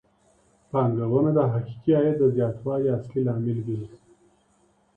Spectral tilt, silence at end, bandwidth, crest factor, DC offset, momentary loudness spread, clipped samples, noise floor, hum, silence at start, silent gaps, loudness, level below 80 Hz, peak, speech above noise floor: -11 dB/octave; 1 s; 3.7 kHz; 16 dB; under 0.1%; 8 LU; under 0.1%; -64 dBFS; none; 0.75 s; none; -24 LUFS; -60 dBFS; -10 dBFS; 41 dB